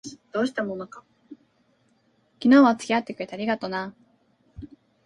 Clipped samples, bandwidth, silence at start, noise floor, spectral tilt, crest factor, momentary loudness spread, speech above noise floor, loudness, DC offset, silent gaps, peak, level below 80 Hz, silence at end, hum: under 0.1%; 11 kHz; 0.05 s; -65 dBFS; -5.5 dB/octave; 20 dB; 25 LU; 43 dB; -23 LUFS; under 0.1%; none; -6 dBFS; -62 dBFS; 0.4 s; none